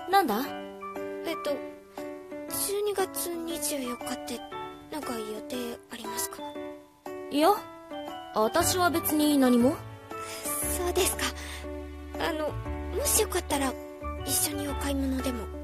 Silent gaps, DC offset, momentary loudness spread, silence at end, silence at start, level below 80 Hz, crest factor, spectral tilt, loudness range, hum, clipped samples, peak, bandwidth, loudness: none; under 0.1%; 15 LU; 0 s; 0 s; -44 dBFS; 20 dB; -3.5 dB/octave; 8 LU; none; under 0.1%; -10 dBFS; 14 kHz; -29 LUFS